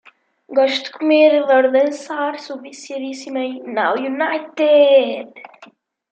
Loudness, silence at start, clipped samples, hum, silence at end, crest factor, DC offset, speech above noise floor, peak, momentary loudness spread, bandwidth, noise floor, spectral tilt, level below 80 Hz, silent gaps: -16 LUFS; 0.5 s; under 0.1%; none; 0.45 s; 16 dB; under 0.1%; 31 dB; -2 dBFS; 17 LU; 8.8 kHz; -48 dBFS; -3 dB/octave; -80 dBFS; none